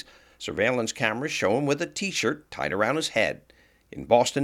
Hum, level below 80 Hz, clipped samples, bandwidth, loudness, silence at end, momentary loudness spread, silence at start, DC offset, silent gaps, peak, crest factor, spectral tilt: none; -60 dBFS; under 0.1%; 16 kHz; -26 LUFS; 0 s; 15 LU; 0.4 s; under 0.1%; none; -6 dBFS; 22 dB; -4 dB/octave